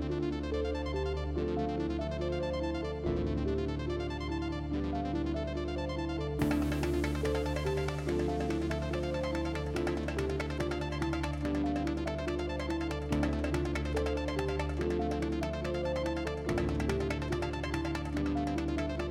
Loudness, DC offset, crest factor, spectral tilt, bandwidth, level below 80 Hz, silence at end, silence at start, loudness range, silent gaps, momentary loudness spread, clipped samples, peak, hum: -34 LUFS; under 0.1%; 16 dB; -7 dB/octave; 14.5 kHz; -40 dBFS; 0 s; 0 s; 2 LU; none; 3 LU; under 0.1%; -18 dBFS; none